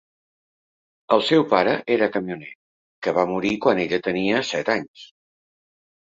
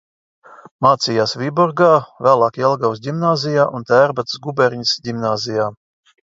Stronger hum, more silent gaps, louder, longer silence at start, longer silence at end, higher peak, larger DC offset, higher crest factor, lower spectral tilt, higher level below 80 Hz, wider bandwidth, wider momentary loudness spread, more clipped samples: neither; first, 2.55-3.02 s, 4.88-4.94 s vs 0.71-0.79 s; second, -21 LUFS vs -17 LUFS; first, 1.1 s vs 0.5 s; first, 1.05 s vs 0.55 s; about the same, -2 dBFS vs 0 dBFS; neither; first, 22 dB vs 16 dB; about the same, -5.5 dB/octave vs -5 dB/octave; about the same, -62 dBFS vs -62 dBFS; about the same, 7.8 kHz vs 7.8 kHz; first, 12 LU vs 7 LU; neither